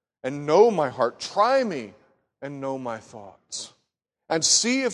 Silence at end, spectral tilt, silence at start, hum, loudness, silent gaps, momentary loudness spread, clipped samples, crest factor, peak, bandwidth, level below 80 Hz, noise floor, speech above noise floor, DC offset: 0 s; -2.5 dB/octave; 0.25 s; none; -22 LUFS; none; 20 LU; under 0.1%; 20 dB; -4 dBFS; 12 kHz; -68 dBFS; -78 dBFS; 54 dB; under 0.1%